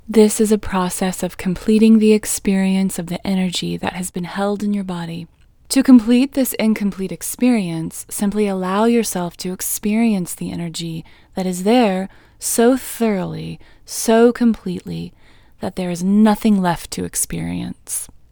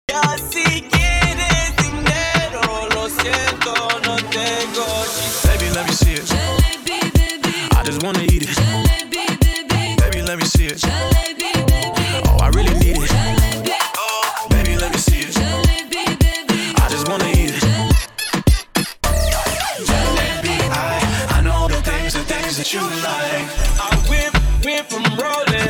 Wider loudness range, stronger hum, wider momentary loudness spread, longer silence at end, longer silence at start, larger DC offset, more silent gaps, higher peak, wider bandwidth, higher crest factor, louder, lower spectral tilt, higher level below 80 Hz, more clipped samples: about the same, 3 LU vs 2 LU; neither; first, 14 LU vs 4 LU; first, 0.25 s vs 0 s; about the same, 0.05 s vs 0.1 s; neither; neither; about the same, 0 dBFS vs 0 dBFS; about the same, over 20 kHz vs 20 kHz; about the same, 18 dB vs 16 dB; about the same, -18 LUFS vs -17 LUFS; about the same, -5 dB/octave vs -4 dB/octave; second, -44 dBFS vs -20 dBFS; neither